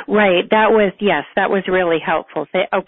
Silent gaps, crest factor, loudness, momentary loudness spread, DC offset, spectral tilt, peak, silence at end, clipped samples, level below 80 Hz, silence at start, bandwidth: none; 14 dB; -16 LUFS; 7 LU; under 0.1%; -10.5 dB/octave; 0 dBFS; 0.05 s; under 0.1%; -50 dBFS; 0 s; 4 kHz